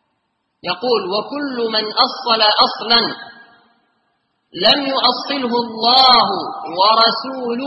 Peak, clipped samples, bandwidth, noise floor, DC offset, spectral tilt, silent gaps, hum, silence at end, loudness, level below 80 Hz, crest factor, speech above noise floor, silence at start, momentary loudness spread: 0 dBFS; under 0.1%; 10.5 kHz; -69 dBFS; under 0.1%; -4.5 dB/octave; none; none; 0 s; -14 LUFS; -56 dBFS; 18 dB; 54 dB; 0.65 s; 13 LU